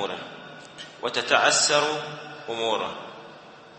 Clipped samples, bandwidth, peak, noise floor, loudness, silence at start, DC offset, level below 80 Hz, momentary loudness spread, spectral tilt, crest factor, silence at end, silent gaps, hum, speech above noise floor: under 0.1%; 8.8 kHz; -4 dBFS; -46 dBFS; -23 LUFS; 0 s; under 0.1%; -72 dBFS; 23 LU; -1 dB/octave; 24 dB; 0 s; none; none; 22 dB